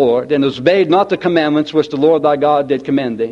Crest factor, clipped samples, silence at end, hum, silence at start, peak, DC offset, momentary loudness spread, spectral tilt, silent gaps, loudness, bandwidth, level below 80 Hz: 14 dB; under 0.1%; 0 s; none; 0 s; 0 dBFS; under 0.1%; 4 LU; -7 dB/octave; none; -14 LUFS; 7.6 kHz; -56 dBFS